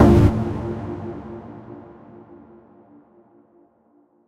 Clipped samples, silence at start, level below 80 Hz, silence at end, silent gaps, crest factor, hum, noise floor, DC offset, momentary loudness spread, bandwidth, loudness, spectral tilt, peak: under 0.1%; 0 s; -32 dBFS; 2.45 s; none; 22 dB; none; -59 dBFS; under 0.1%; 28 LU; 12 kHz; -21 LUFS; -9 dB/octave; 0 dBFS